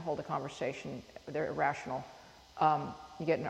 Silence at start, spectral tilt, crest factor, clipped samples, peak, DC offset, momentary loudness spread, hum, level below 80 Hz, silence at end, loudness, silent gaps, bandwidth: 0 s; -6 dB/octave; 20 dB; under 0.1%; -16 dBFS; under 0.1%; 16 LU; none; -66 dBFS; 0 s; -36 LUFS; none; 12.5 kHz